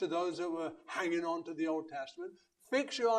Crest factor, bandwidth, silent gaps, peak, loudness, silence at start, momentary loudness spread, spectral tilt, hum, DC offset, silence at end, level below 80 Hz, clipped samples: 16 dB; 11.5 kHz; none; -20 dBFS; -37 LUFS; 0 s; 10 LU; -4 dB/octave; none; under 0.1%; 0 s; -84 dBFS; under 0.1%